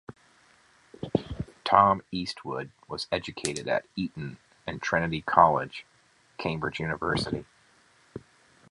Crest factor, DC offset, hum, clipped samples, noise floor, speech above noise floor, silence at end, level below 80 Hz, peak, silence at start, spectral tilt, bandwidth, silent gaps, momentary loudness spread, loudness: 28 dB; under 0.1%; none; under 0.1%; -63 dBFS; 36 dB; 0.5 s; -54 dBFS; -2 dBFS; 0.1 s; -5 dB/octave; 11.5 kHz; none; 20 LU; -28 LUFS